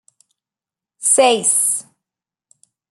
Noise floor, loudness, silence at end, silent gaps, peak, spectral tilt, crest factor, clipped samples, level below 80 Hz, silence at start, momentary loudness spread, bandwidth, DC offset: -89 dBFS; -14 LUFS; 1.1 s; none; -2 dBFS; -0.5 dB/octave; 18 dB; under 0.1%; -78 dBFS; 1 s; 9 LU; 12.5 kHz; under 0.1%